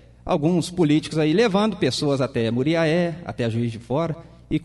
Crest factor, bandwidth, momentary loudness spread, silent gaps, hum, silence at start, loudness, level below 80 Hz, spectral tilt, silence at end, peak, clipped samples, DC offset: 16 dB; 11.5 kHz; 8 LU; none; none; 0.25 s; -22 LUFS; -48 dBFS; -6.5 dB/octave; 0 s; -6 dBFS; under 0.1%; under 0.1%